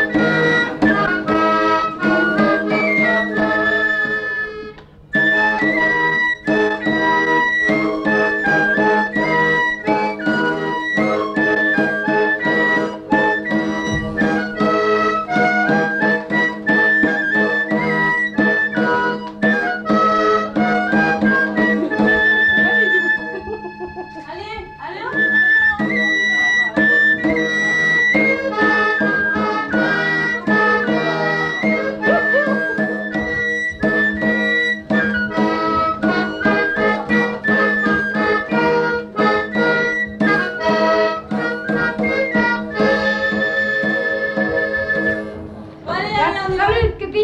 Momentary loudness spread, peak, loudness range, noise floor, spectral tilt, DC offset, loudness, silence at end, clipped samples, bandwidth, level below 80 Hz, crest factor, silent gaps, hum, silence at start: 6 LU; -4 dBFS; 3 LU; -37 dBFS; -5.5 dB/octave; under 0.1%; -16 LUFS; 0 s; under 0.1%; 8.8 kHz; -44 dBFS; 14 dB; none; none; 0 s